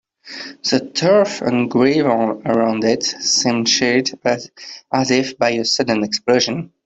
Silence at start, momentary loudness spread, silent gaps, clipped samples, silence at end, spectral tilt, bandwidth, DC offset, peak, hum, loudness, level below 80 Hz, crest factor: 0.25 s; 8 LU; none; under 0.1%; 0.2 s; -3.5 dB/octave; 8.2 kHz; under 0.1%; -2 dBFS; none; -17 LUFS; -58 dBFS; 16 dB